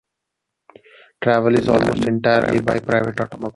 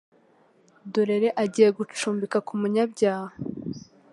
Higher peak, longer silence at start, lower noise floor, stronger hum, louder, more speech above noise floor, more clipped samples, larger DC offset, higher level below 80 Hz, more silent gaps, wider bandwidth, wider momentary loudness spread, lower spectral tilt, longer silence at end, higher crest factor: first, -2 dBFS vs -6 dBFS; first, 1.2 s vs 0.85 s; first, -80 dBFS vs -60 dBFS; neither; first, -18 LUFS vs -25 LUFS; first, 62 dB vs 36 dB; neither; neither; first, -48 dBFS vs -68 dBFS; neither; about the same, 11.5 kHz vs 11.5 kHz; second, 7 LU vs 14 LU; first, -7 dB/octave vs -5.5 dB/octave; second, 0.05 s vs 0.35 s; about the same, 16 dB vs 20 dB